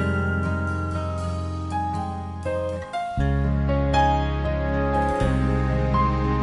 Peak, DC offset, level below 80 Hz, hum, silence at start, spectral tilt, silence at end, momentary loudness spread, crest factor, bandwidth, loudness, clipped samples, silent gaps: -8 dBFS; under 0.1%; -30 dBFS; none; 0 s; -7.5 dB/octave; 0 s; 7 LU; 14 dB; 11 kHz; -24 LUFS; under 0.1%; none